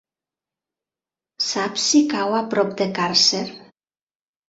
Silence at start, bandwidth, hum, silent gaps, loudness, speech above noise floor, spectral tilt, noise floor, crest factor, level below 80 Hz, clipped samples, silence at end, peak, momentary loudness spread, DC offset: 1.4 s; 8 kHz; none; none; -19 LUFS; over 70 dB; -2.5 dB/octave; under -90 dBFS; 18 dB; -68 dBFS; under 0.1%; 0.9 s; -4 dBFS; 9 LU; under 0.1%